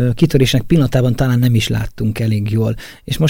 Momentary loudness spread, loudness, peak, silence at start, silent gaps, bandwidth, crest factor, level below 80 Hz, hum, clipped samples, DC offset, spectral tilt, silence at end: 8 LU; -15 LUFS; -2 dBFS; 0 s; none; 17 kHz; 14 dB; -32 dBFS; none; under 0.1%; under 0.1%; -6.5 dB/octave; 0 s